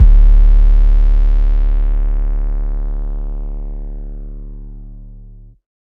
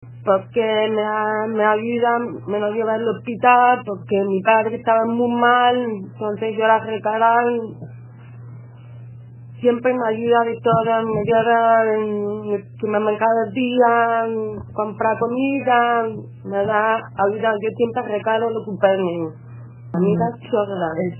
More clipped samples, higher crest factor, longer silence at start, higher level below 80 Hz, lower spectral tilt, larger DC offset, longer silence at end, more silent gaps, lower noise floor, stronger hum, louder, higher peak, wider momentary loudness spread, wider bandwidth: neither; second, 12 dB vs 18 dB; about the same, 0 s vs 0 s; first, -12 dBFS vs -60 dBFS; about the same, -9.5 dB/octave vs -8.5 dB/octave; neither; first, 0.65 s vs 0 s; neither; about the same, -37 dBFS vs -38 dBFS; neither; about the same, -17 LUFS vs -19 LUFS; about the same, 0 dBFS vs 0 dBFS; first, 22 LU vs 11 LU; second, 2 kHz vs 3.2 kHz